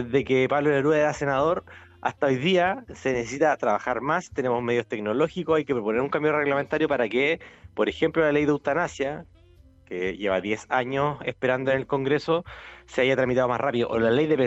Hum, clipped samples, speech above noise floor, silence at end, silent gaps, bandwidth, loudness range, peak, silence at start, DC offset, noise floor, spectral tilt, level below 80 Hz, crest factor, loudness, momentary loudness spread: none; under 0.1%; 29 dB; 0 s; none; 8.2 kHz; 2 LU; -8 dBFS; 0 s; under 0.1%; -54 dBFS; -6 dB/octave; -54 dBFS; 16 dB; -24 LUFS; 8 LU